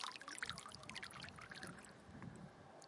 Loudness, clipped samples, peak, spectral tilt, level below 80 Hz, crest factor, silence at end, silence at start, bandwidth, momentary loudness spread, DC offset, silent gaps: -52 LUFS; under 0.1%; -26 dBFS; -2.5 dB/octave; -76 dBFS; 26 dB; 0 s; 0 s; 11.5 kHz; 11 LU; under 0.1%; none